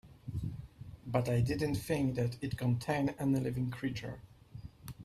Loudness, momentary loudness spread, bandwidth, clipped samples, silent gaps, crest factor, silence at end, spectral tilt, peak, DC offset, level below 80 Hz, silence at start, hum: -35 LUFS; 18 LU; 14.5 kHz; under 0.1%; none; 20 dB; 0 s; -7 dB/octave; -16 dBFS; under 0.1%; -56 dBFS; 0.05 s; none